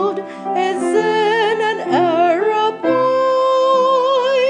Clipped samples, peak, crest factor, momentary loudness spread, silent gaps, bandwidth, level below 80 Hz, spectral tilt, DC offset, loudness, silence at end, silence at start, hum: under 0.1%; -2 dBFS; 12 dB; 5 LU; none; 10 kHz; -80 dBFS; -4.5 dB/octave; under 0.1%; -16 LUFS; 0 s; 0 s; none